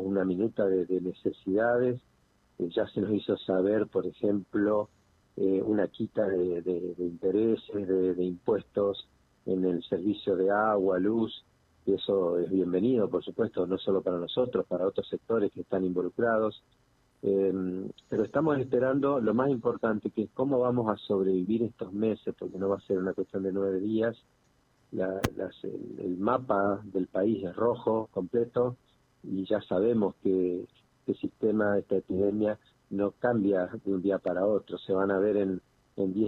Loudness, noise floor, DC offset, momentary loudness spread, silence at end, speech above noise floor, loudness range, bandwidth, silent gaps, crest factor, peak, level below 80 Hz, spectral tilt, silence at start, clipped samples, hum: -29 LUFS; -67 dBFS; under 0.1%; 8 LU; 0 s; 39 dB; 3 LU; 13 kHz; none; 22 dB; -8 dBFS; -64 dBFS; -8 dB/octave; 0 s; under 0.1%; none